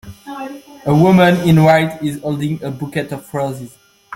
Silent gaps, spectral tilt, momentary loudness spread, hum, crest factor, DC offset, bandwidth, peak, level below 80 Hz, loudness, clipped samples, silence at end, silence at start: none; -7 dB/octave; 19 LU; none; 14 dB; under 0.1%; 16.5 kHz; -2 dBFS; -48 dBFS; -15 LUFS; under 0.1%; 0 s; 0.05 s